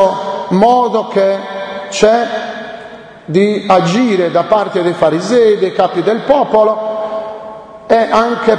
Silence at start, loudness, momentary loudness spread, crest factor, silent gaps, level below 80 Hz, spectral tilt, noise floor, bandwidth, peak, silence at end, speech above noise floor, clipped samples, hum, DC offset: 0 s; -12 LUFS; 16 LU; 12 dB; none; -48 dBFS; -5.5 dB/octave; -32 dBFS; 10 kHz; 0 dBFS; 0 s; 21 dB; 0.1%; none; under 0.1%